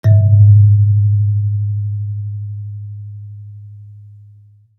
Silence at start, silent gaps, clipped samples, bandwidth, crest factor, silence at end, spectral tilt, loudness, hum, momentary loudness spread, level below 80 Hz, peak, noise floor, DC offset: 0.05 s; none; under 0.1%; 2 kHz; 12 dB; 0.8 s; -11.5 dB/octave; -13 LUFS; none; 24 LU; -50 dBFS; -2 dBFS; -45 dBFS; under 0.1%